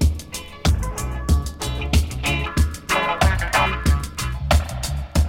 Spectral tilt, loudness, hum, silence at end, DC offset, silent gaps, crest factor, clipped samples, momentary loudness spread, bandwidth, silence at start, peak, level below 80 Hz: -4.5 dB/octave; -22 LUFS; none; 0 s; under 0.1%; none; 16 dB; under 0.1%; 8 LU; 16.5 kHz; 0 s; -4 dBFS; -24 dBFS